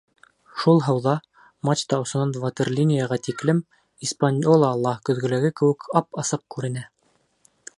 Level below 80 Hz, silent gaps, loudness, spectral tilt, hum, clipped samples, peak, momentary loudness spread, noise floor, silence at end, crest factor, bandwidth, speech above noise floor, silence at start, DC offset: -66 dBFS; none; -23 LUFS; -6 dB/octave; none; under 0.1%; -2 dBFS; 11 LU; -66 dBFS; 0.9 s; 20 dB; 11.5 kHz; 44 dB; 0.55 s; under 0.1%